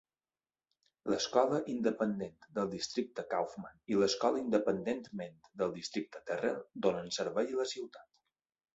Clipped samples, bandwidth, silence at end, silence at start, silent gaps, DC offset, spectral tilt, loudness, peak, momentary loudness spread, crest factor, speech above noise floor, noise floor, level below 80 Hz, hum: under 0.1%; 8 kHz; 0.7 s; 1.05 s; none; under 0.1%; -4 dB/octave; -35 LUFS; -14 dBFS; 11 LU; 22 dB; over 55 dB; under -90 dBFS; -74 dBFS; none